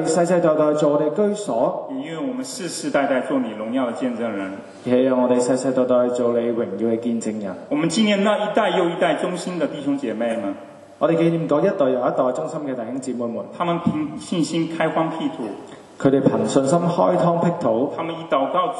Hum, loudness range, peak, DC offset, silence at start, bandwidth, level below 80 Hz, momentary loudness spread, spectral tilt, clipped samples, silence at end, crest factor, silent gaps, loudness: none; 3 LU; -2 dBFS; under 0.1%; 0 s; 11.5 kHz; -66 dBFS; 10 LU; -6 dB/octave; under 0.1%; 0 s; 18 dB; none; -21 LUFS